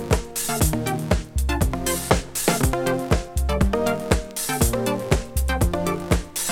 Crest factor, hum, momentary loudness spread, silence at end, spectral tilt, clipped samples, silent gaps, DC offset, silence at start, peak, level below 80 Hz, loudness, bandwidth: 18 dB; none; 4 LU; 0 s; -4.5 dB/octave; under 0.1%; none; under 0.1%; 0 s; -4 dBFS; -28 dBFS; -23 LUFS; 18.5 kHz